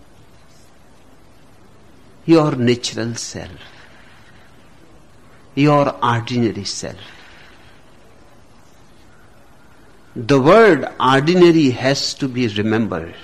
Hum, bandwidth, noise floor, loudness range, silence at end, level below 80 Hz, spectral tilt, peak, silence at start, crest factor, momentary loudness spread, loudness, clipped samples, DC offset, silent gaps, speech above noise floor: none; 12.5 kHz; -49 dBFS; 11 LU; 0 s; -50 dBFS; -5.5 dB/octave; -4 dBFS; 2.25 s; 16 dB; 18 LU; -16 LUFS; under 0.1%; 0.5%; none; 33 dB